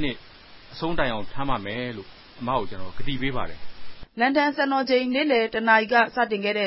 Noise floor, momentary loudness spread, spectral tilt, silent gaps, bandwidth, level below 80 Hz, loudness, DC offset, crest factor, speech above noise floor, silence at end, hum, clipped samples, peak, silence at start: -47 dBFS; 17 LU; -9 dB/octave; none; 5.8 kHz; -46 dBFS; -24 LUFS; under 0.1%; 20 dB; 24 dB; 0 s; none; under 0.1%; -4 dBFS; 0 s